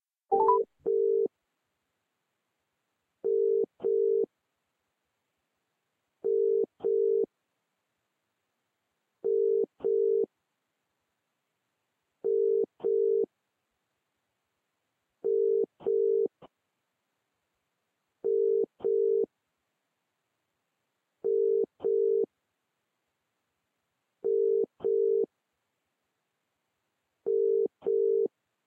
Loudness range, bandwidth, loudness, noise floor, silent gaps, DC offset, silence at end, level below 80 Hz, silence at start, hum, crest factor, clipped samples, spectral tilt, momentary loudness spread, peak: 0 LU; 1.6 kHz; -29 LUFS; -82 dBFS; none; under 0.1%; 0.4 s; -86 dBFS; 0.3 s; none; 18 dB; under 0.1%; -9.5 dB/octave; 10 LU; -12 dBFS